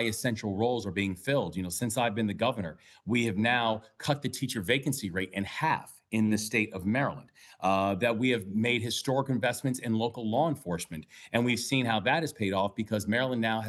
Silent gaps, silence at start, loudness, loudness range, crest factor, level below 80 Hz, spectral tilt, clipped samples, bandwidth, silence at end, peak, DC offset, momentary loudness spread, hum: none; 0 s; -30 LUFS; 1 LU; 20 dB; -64 dBFS; -5 dB/octave; under 0.1%; 13 kHz; 0 s; -10 dBFS; under 0.1%; 7 LU; none